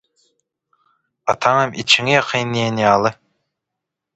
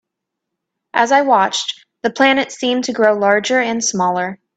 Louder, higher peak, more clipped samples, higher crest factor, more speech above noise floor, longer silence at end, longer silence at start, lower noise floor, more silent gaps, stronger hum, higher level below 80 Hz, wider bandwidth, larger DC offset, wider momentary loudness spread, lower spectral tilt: about the same, -16 LUFS vs -16 LUFS; about the same, 0 dBFS vs 0 dBFS; neither; about the same, 20 dB vs 16 dB; about the same, 65 dB vs 64 dB; first, 1 s vs 0.2 s; first, 1.25 s vs 0.95 s; about the same, -82 dBFS vs -79 dBFS; neither; neither; first, -58 dBFS vs -64 dBFS; about the same, 8.8 kHz vs 9.2 kHz; neither; about the same, 9 LU vs 9 LU; about the same, -4 dB/octave vs -3 dB/octave